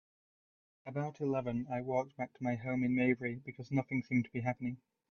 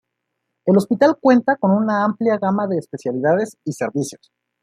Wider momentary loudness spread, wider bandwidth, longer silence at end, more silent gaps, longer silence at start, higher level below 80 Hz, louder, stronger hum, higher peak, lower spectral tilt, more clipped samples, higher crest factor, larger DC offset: about the same, 11 LU vs 11 LU; second, 6.6 kHz vs 13.5 kHz; about the same, 0.35 s vs 0.45 s; neither; first, 0.85 s vs 0.65 s; about the same, -68 dBFS vs -66 dBFS; second, -36 LUFS vs -18 LUFS; neither; second, -18 dBFS vs -2 dBFS; first, -9 dB/octave vs -7 dB/octave; neither; about the same, 18 dB vs 16 dB; neither